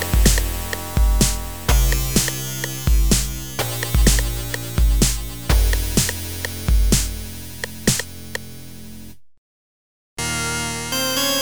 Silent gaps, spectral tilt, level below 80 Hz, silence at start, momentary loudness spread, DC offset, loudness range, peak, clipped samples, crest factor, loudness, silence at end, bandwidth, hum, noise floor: 9.38-10.17 s; -3.5 dB/octave; -22 dBFS; 0 s; 14 LU; 1%; 7 LU; -2 dBFS; under 0.1%; 18 dB; -20 LUFS; 0 s; over 20 kHz; none; -40 dBFS